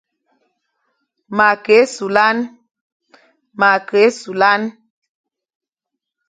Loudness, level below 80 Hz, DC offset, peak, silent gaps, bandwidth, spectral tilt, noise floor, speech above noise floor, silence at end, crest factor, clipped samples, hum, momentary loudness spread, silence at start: -14 LUFS; -66 dBFS; under 0.1%; 0 dBFS; 2.81-3.00 s; 9.4 kHz; -4 dB/octave; -81 dBFS; 67 dB; 1.6 s; 18 dB; under 0.1%; none; 11 LU; 1.3 s